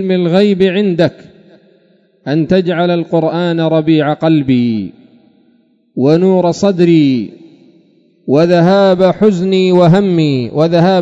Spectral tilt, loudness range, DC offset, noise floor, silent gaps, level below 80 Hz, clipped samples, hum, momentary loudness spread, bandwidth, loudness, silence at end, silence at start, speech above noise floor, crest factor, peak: -8 dB/octave; 3 LU; under 0.1%; -52 dBFS; none; -50 dBFS; 0.4%; none; 8 LU; 7.8 kHz; -11 LUFS; 0 s; 0 s; 42 dB; 12 dB; 0 dBFS